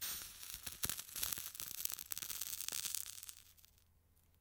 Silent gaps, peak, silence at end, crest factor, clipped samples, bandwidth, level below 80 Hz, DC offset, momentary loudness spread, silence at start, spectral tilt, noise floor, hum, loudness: none; -12 dBFS; 0.2 s; 34 dB; under 0.1%; 19 kHz; -68 dBFS; under 0.1%; 7 LU; 0 s; 0.5 dB/octave; -72 dBFS; none; -42 LUFS